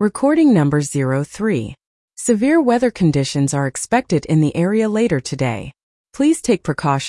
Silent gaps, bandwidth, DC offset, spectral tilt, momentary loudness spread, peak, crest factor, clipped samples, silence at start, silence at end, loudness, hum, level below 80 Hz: 1.86-2.08 s, 5.83-6.04 s; 12 kHz; under 0.1%; -6 dB/octave; 7 LU; -4 dBFS; 14 dB; under 0.1%; 0 s; 0 s; -17 LUFS; none; -48 dBFS